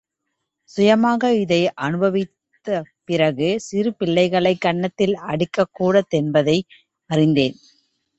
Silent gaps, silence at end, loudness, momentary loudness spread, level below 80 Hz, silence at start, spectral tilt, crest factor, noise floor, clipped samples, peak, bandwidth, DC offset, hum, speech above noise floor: none; 0.65 s; -19 LUFS; 9 LU; -58 dBFS; 0.75 s; -6.5 dB/octave; 18 dB; -78 dBFS; under 0.1%; -2 dBFS; 8.2 kHz; under 0.1%; none; 59 dB